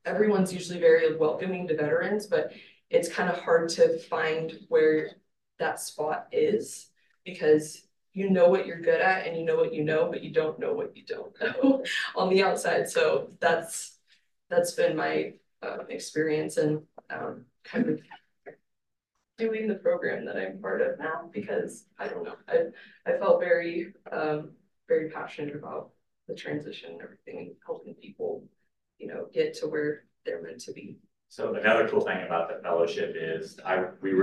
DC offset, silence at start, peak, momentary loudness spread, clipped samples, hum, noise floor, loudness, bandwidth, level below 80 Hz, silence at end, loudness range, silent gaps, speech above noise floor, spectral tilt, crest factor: under 0.1%; 0.05 s; -10 dBFS; 16 LU; under 0.1%; none; -84 dBFS; -28 LUFS; 12.5 kHz; -78 dBFS; 0 s; 9 LU; none; 56 dB; -5 dB/octave; 20 dB